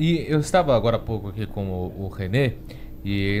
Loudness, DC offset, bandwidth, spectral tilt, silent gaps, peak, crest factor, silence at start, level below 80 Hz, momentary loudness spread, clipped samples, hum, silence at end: -24 LUFS; under 0.1%; 15 kHz; -6.5 dB/octave; none; -6 dBFS; 16 dB; 0 s; -38 dBFS; 12 LU; under 0.1%; none; 0 s